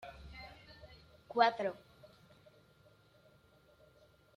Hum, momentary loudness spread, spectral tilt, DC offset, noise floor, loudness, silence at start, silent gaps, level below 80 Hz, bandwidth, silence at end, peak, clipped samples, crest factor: none; 26 LU; -5 dB/octave; under 0.1%; -66 dBFS; -34 LUFS; 0.05 s; none; -66 dBFS; 11.5 kHz; 2.6 s; -16 dBFS; under 0.1%; 26 dB